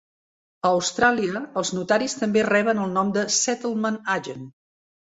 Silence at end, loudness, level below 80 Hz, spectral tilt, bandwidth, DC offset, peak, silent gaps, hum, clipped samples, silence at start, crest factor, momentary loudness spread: 0.6 s; -22 LUFS; -62 dBFS; -3.5 dB/octave; 8 kHz; under 0.1%; -4 dBFS; none; none; under 0.1%; 0.65 s; 18 dB; 7 LU